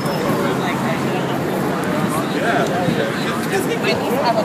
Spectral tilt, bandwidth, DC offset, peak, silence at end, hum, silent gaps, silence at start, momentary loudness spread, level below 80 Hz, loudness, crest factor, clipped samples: -5.5 dB/octave; 15.5 kHz; under 0.1%; -4 dBFS; 0 s; none; none; 0 s; 3 LU; -52 dBFS; -19 LUFS; 14 dB; under 0.1%